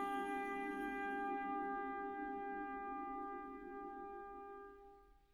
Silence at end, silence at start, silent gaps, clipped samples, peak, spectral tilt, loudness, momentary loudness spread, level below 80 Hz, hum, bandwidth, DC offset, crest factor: 0.2 s; 0 s; none; under 0.1%; -32 dBFS; -5.5 dB/octave; -45 LUFS; 11 LU; -70 dBFS; none; 15.5 kHz; under 0.1%; 14 dB